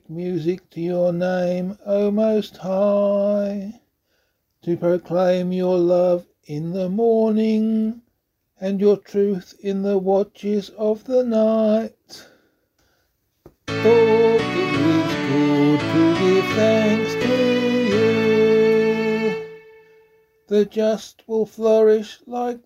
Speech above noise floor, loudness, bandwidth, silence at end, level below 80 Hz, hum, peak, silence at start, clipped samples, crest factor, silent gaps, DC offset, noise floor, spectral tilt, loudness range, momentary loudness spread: 51 dB; -19 LUFS; 13.5 kHz; 0.05 s; -58 dBFS; none; -4 dBFS; 0.1 s; under 0.1%; 16 dB; none; under 0.1%; -71 dBFS; -7 dB/octave; 5 LU; 11 LU